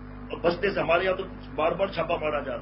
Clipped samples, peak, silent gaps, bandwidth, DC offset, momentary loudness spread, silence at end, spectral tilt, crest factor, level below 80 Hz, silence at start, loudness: under 0.1%; -10 dBFS; none; 5.8 kHz; under 0.1%; 8 LU; 0 s; -9.5 dB/octave; 18 dB; -46 dBFS; 0 s; -27 LUFS